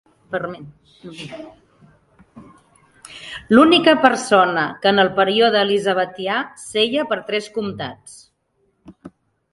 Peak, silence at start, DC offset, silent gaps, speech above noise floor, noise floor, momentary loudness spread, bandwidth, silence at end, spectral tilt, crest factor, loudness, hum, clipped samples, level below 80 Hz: 0 dBFS; 0.3 s; under 0.1%; none; 48 dB; -66 dBFS; 22 LU; 11.5 kHz; 0.45 s; -4 dB/octave; 20 dB; -17 LUFS; none; under 0.1%; -58 dBFS